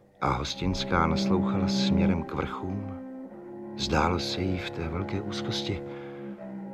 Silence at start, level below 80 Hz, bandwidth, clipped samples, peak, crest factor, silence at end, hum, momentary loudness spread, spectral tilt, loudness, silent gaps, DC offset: 0.2 s; -44 dBFS; 11.5 kHz; under 0.1%; -10 dBFS; 20 dB; 0 s; none; 15 LU; -5.5 dB/octave; -28 LUFS; none; under 0.1%